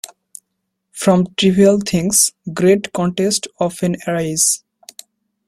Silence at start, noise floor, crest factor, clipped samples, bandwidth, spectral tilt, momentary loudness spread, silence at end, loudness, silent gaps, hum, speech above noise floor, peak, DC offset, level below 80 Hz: 0.95 s; -74 dBFS; 18 dB; under 0.1%; 16 kHz; -4 dB/octave; 8 LU; 0.9 s; -16 LUFS; none; none; 59 dB; 0 dBFS; under 0.1%; -52 dBFS